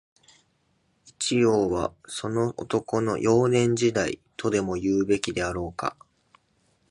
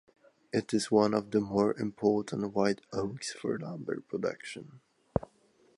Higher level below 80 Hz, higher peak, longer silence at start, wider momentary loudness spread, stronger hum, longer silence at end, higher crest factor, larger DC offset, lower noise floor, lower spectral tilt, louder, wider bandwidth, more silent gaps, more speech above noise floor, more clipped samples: first, -52 dBFS vs -60 dBFS; about the same, -8 dBFS vs -10 dBFS; first, 1.05 s vs 0.55 s; about the same, 9 LU vs 10 LU; neither; first, 1 s vs 0.6 s; about the same, 18 dB vs 22 dB; neither; about the same, -69 dBFS vs -66 dBFS; about the same, -5 dB/octave vs -5.5 dB/octave; first, -25 LUFS vs -32 LUFS; about the same, 11.5 kHz vs 11.5 kHz; neither; first, 44 dB vs 35 dB; neither